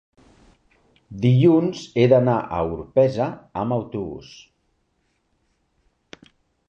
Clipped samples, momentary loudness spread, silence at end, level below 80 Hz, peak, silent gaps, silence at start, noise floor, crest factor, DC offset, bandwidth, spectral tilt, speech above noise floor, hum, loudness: under 0.1%; 15 LU; 2.5 s; -52 dBFS; -4 dBFS; none; 1.1 s; -69 dBFS; 20 dB; under 0.1%; 7.2 kHz; -8.5 dB/octave; 49 dB; none; -20 LUFS